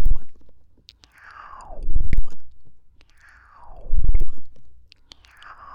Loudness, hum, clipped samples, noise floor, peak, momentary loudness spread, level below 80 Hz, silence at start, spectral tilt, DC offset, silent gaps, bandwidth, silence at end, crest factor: -31 LUFS; none; under 0.1%; -52 dBFS; -6 dBFS; 24 LU; -24 dBFS; 0 s; -7 dB/octave; under 0.1%; none; 2.4 kHz; 1.05 s; 10 dB